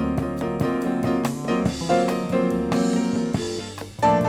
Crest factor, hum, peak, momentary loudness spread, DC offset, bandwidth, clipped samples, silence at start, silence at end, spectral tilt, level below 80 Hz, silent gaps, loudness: 14 dB; none; -8 dBFS; 5 LU; under 0.1%; 16 kHz; under 0.1%; 0 s; 0 s; -6 dB/octave; -44 dBFS; none; -23 LUFS